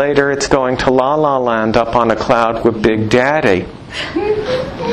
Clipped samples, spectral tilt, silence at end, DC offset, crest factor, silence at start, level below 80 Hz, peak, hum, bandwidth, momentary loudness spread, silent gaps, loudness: under 0.1%; -5.5 dB/octave; 0 s; under 0.1%; 14 dB; 0 s; -38 dBFS; 0 dBFS; none; 11.5 kHz; 6 LU; none; -14 LUFS